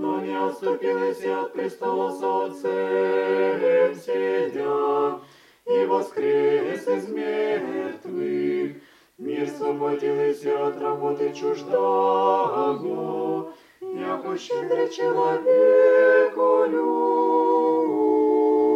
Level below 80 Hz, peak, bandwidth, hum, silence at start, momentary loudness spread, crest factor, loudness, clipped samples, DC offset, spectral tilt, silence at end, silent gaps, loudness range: -78 dBFS; -8 dBFS; 11.5 kHz; none; 0 s; 9 LU; 16 dB; -23 LUFS; under 0.1%; under 0.1%; -6 dB/octave; 0 s; none; 7 LU